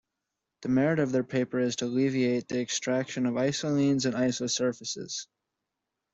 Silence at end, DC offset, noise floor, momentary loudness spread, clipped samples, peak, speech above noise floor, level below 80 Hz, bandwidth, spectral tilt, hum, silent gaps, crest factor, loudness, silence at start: 0.9 s; under 0.1%; -85 dBFS; 9 LU; under 0.1%; -12 dBFS; 58 dB; -68 dBFS; 8 kHz; -4.5 dB/octave; none; none; 16 dB; -28 LUFS; 0.6 s